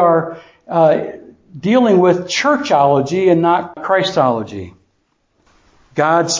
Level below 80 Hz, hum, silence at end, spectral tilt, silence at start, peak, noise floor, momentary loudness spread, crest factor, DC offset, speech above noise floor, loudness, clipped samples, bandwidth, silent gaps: -54 dBFS; none; 0 s; -5 dB/octave; 0 s; 0 dBFS; -63 dBFS; 16 LU; 14 dB; under 0.1%; 49 dB; -14 LUFS; under 0.1%; 7.6 kHz; none